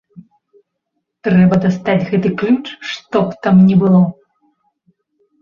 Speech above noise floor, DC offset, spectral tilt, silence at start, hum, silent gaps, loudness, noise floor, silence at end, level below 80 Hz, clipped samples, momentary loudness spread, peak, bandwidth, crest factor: 61 dB; under 0.1%; -8.5 dB/octave; 1.25 s; none; none; -14 LUFS; -73 dBFS; 1.3 s; -50 dBFS; under 0.1%; 9 LU; -2 dBFS; 7 kHz; 14 dB